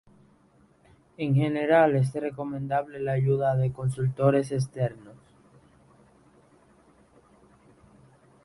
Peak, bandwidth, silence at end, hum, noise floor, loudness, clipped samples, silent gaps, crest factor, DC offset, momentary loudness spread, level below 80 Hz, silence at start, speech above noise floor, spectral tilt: -8 dBFS; 11.5 kHz; 3.3 s; none; -61 dBFS; -26 LUFS; under 0.1%; none; 20 dB; under 0.1%; 11 LU; -60 dBFS; 1.2 s; 36 dB; -8 dB/octave